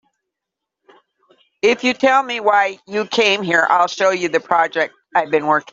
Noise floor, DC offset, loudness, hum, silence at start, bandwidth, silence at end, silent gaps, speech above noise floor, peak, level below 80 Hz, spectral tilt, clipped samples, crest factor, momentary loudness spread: -82 dBFS; under 0.1%; -16 LUFS; none; 1.65 s; 7.8 kHz; 0.1 s; none; 66 dB; 0 dBFS; -66 dBFS; -3.5 dB/octave; under 0.1%; 18 dB; 6 LU